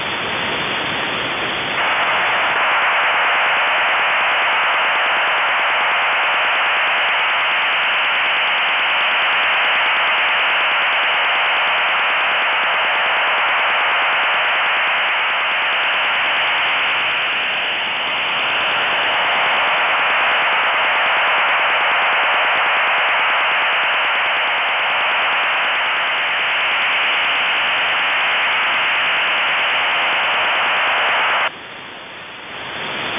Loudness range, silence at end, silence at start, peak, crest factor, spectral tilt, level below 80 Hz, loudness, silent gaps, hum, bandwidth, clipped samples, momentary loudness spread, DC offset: 2 LU; 0 s; 0 s; -8 dBFS; 8 dB; -4.5 dB/octave; -58 dBFS; -15 LUFS; none; none; 4 kHz; under 0.1%; 4 LU; under 0.1%